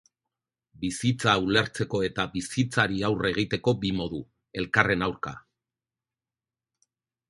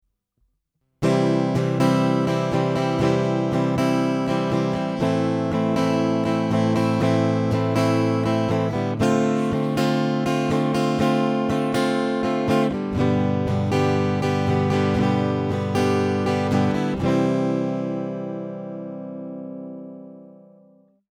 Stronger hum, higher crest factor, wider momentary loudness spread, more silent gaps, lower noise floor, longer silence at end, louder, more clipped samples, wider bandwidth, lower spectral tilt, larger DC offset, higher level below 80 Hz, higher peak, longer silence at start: neither; first, 26 dB vs 16 dB; first, 12 LU vs 9 LU; neither; first, under -90 dBFS vs -73 dBFS; first, 1.9 s vs 0.9 s; second, -26 LUFS vs -22 LUFS; neither; second, 11.5 kHz vs 15.5 kHz; second, -5 dB/octave vs -7 dB/octave; neither; about the same, -52 dBFS vs -50 dBFS; about the same, -4 dBFS vs -6 dBFS; second, 0.8 s vs 1 s